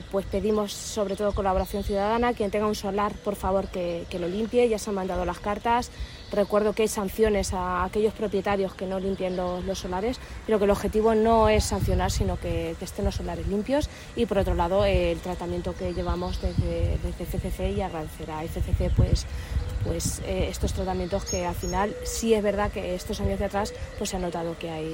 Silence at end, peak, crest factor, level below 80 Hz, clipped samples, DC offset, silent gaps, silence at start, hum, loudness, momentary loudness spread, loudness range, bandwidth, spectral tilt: 0 s; -8 dBFS; 18 dB; -36 dBFS; under 0.1%; under 0.1%; none; 0 s; none; -27 LUFS; 8 LU; 4 LU; 16.5 kHz; -5.5 dB/octave